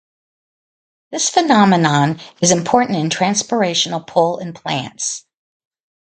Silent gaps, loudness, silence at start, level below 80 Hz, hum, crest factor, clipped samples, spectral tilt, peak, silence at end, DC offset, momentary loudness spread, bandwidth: none; -16 LUFS; 1.1 s; -60 dBFS; none; 18 dB; under 0.1%; -4 dB/octave; 0 dBFS; 0.95 s; under 0.1%; 11 LU; 9.6 kHz